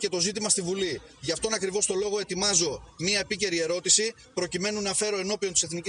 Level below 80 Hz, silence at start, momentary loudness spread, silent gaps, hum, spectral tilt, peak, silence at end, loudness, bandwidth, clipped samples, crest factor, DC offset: -58 dBFS; 0 s; 9 LU; none; none; -2 dB/octave; -8 dBFS; 0 s; -26 LUFS; 11.5 kHz; under 0.1%; 20 dB; under 0.1%